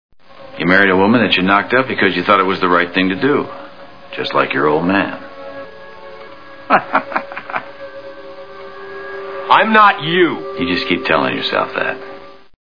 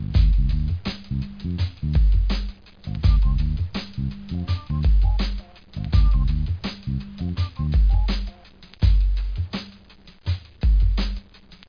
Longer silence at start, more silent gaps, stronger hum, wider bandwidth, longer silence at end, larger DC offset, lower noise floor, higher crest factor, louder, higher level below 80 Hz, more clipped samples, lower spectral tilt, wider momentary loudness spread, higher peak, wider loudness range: first, 0.4 s vs 0 s; neither; neither; about the same, 5.4 kHz vs 5.2 kHz; first, 0.3 s vs 0.05 s; first, 1% vs under 0.1%; second, -37 dBFS vs -48 dBFS; about the same, 16 dB vs 14 dB; first, -14 LUFS vs -24 LUFS; second, -54 dBFS vs -22 dBFS; neither; about the same, -7 dB/octave vs -8 dB/octave; first, 23 LU vs 11 LU; first, 0 dBFS vs -6 dBFS; first, 9 LU vs 1 LU